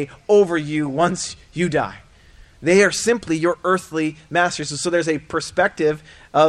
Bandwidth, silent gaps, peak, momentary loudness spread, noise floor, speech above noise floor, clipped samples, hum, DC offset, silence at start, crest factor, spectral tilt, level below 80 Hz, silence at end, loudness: 13.5 kHz; none; -2 dBFS; 9 LU; -47 dBFS; 28 dB; under 0.1%; none; under 0.1%; 0 s; 18 dB; -4.5 dB/octave; -50 dBFS; 0 s; -20 LUFS